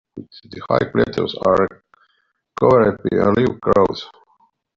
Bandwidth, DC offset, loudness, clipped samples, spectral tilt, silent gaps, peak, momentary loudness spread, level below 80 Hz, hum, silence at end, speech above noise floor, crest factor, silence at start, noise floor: 7.4 kHz; under 0.1%; -17 LUFS; under 0.1%; -5.5 dB/octave; none; -2 dBFS; 22 LU; -48 dBFS; none; 0.7 s; 49 dB; 16 dB; 0.15 s; -66 dBFS